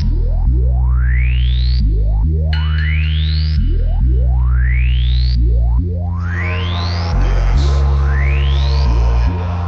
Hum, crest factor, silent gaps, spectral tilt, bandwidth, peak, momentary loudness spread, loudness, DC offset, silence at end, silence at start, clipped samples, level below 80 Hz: none; 10 dB; none; -7 dB/octave; 6.4 kHz; -2 dBFS; 3 LU; -16 LUFS; 0.5%; 0 s; 0 s; under 0.1%; -14 dBFS